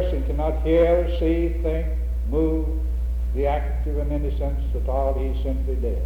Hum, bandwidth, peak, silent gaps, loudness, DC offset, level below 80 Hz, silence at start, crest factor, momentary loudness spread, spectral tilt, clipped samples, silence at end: none; 4 kHz; -8 dBFS; none; -24 LUFS; under 0.1%; -24 dBFS; 0 s; 14 dB; 7 LU; -9 dB/octave; under 0.1%; 0 s